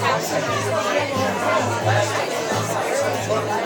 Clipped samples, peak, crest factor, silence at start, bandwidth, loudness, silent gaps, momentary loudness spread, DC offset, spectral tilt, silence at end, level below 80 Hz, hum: under 0.1%; -6 dBFS; 14 dB; 0 s; 19 kHz; -21 LUFS; none; 3 LU; under 0.1%; -4 dB/octave; 0 s; -60 dBFS; none